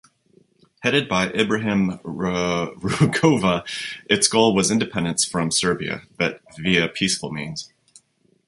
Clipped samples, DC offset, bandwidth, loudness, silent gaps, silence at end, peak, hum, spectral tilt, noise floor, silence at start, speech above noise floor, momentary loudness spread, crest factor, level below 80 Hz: under 0.1%; under 0.1%; 11.5 kHz; -21 LUFS; none; 0.8 s; -2 dBFS; none; -4 dB/octave; -61 dBFS; 0.8 s; 40 dB; 12 LU; 20 dB; -52 dBFS